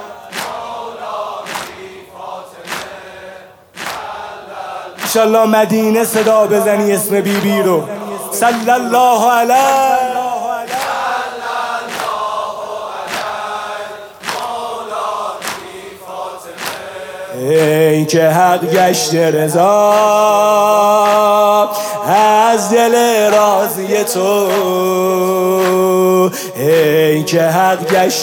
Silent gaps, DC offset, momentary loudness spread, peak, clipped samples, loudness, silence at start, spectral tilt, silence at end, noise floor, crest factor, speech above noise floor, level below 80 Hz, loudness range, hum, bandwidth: none; under 0.1%; 16 LU; 0 dBFS; under 0.1%; -13 LUFS; 0 s; -4 dB/octave; 0 s; -36 dBFS; 14 dB; 25 dB; -62 dBFS; 12 LU; none; 18.5 kHz